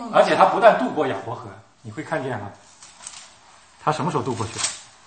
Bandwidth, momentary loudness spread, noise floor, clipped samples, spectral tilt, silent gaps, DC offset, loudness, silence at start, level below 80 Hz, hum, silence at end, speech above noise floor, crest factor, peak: 8.8 kHz; 23 LU; -51 dBFS; under 0.1%; -4 dB/octave; none; under 0.1%; -21 LUFS; 0 s; -64 dBFS; none; 0.2 s; 30 dB; 22 dB; 0 dBFS